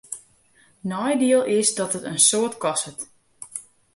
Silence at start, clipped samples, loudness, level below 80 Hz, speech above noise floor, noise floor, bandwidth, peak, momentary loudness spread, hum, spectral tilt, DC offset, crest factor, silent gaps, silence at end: 0.1 s; under 0.1%; -21 LUFS; -68 dBFS; 37 dB; -58 dBFS; 11.5 kHz; -4 dBFS; 20 LU; none; -2.5 dB/octave; under 0.1%; 20 dB; none; 0.35 s